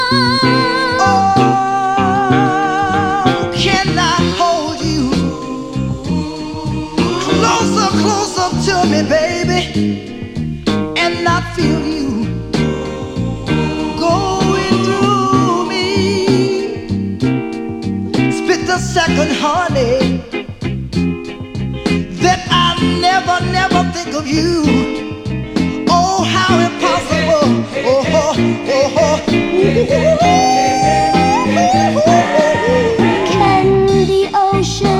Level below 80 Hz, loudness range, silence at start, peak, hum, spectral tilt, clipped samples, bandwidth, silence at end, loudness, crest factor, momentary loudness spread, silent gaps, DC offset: -34 dBFS; 5 LU; 0 s; 0 dBFS; none; -5 dB/octave; under 0.1%; 14 kHz; 0 s; -14 LUFS; 14 dB; 9 LU; none; under 0.1%